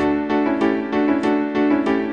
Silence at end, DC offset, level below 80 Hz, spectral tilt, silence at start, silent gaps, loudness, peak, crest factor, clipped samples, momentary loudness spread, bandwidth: 0 s; 0.2%; -50 dBFS; -7 dB/octave; 0 s; none; -19 LUFS; -6 dBFS; 12 dB; under 0.1%; 2 LU; 7.2 kHz